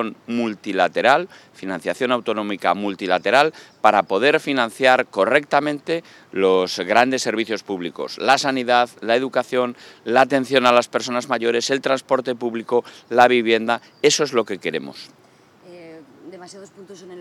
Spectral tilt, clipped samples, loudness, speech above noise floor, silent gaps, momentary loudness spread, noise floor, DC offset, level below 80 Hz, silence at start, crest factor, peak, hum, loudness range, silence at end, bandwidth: -3.5 dB/octave; under 0.1%; -19 LUFS; 30 dB; none; 11 LU; -49 dBFS; under 0.1%; -74 dBFS; 0 s; 20 dB; 0 dBFS; none; 3 LU; 0 s; 15 kHz